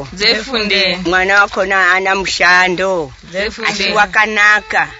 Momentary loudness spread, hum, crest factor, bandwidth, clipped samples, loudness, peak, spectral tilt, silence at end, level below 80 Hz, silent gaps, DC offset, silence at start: 8 LU; none; 14 dB; 8 kHz; under 0.1%; -12 LUFS; 0 dBFS; -2.5 dB/octave; 0 s; -40 dBFS; none; under 0.1%; 0 s